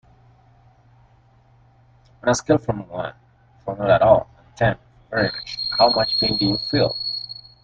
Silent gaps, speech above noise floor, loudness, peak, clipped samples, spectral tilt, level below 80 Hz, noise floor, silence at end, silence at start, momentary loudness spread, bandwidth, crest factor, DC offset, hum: none; 35 dB; -20 LUFS; -2 dBFS; under 0.1%; -4.5 dB/octave; -48 dBFS; -55 dBFS; 0.25 s; 2.25 s; 16 LU; 9.2 kHz; 22 dB; under 0.1%; none